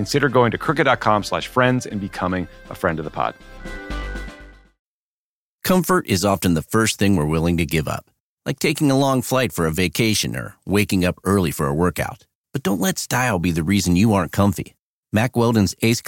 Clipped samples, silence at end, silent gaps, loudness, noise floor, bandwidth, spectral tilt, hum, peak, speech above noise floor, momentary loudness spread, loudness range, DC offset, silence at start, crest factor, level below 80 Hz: under 0.1%; 0 s; 4.79-5.59 s, 8.20-8.37 s, 12.35-12.44 s, 14.79-15.03 s; -20 LUFS; under -90 dBFS; 17 kHz; -5 dB/octave; none; -2 dBFS; over 71 dB; 13 LU; 6 LU; under 0.1%; 0 s; 18 dB; -40 dBFS